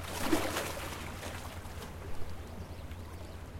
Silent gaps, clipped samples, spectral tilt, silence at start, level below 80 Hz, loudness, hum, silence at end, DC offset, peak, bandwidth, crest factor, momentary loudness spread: none; under 0.1%; -4 dB/octave; 0 s; -50 dBFS; -39 LUFS; none; 0 s; under 0.1%; -14 dBFS; 16.5 kHz; 22 dB; 13 LU